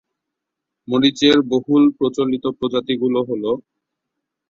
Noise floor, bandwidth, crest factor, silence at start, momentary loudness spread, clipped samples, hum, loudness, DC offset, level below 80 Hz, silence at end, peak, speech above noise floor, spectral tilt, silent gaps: -81 dBFS; 7.6 kHz; 18 dB; 0.9 s; 8 LU; under 0.1%; none; -18 LUFS; under 0.1%; -58 dBFS; 0.9 s; -2 dBFS; 64 dB; -5.5 dB/octave; none